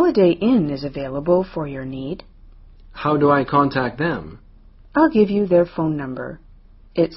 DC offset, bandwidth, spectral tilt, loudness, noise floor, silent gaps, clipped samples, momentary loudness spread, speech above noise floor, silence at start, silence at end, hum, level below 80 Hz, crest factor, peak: under 0.1%; 5.8 kHz; -6 dB/octave; -19 LUFS; -46 dBFS; none; under 0.1%; 14 LU; 27 dB; 0 s; 0 s; none; -44 dBFS; 18 dB; -2 dBFS